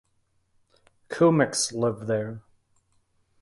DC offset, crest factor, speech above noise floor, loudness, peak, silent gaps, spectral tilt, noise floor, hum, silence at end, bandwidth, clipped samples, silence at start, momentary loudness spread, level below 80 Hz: under 0.1%; 20 dB; 46 dB; -24 LUFS; -8 dBFS; none; -4.5 dB/octave; -70 dBFS; none; 1.05 s; 11.5 kHz; under 0.1%; 1.1 s; 17 LU; -64 dBFS